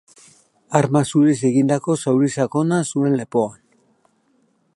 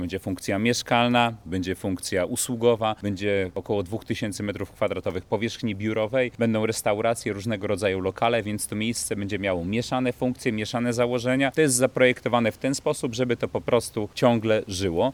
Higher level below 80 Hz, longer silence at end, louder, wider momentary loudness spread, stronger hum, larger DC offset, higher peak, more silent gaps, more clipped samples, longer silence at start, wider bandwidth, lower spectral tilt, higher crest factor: second, -64 dBFS vs -56 dBFS; first, 1.2 s vs 0 s; first, -19 LUFS vs -25 LUFS; about the same, 6 LU vs 8 LU; neither; neither; about the same, -2 dBFS vs -4 dBFS; neither; neither; first, 0.7 s vs 0 s; second, 11.5 kHz vs 19 kHz; first, -6.5 dB/octave vs -4.5 dB/octave; about the same, 18 dB vs 20 dB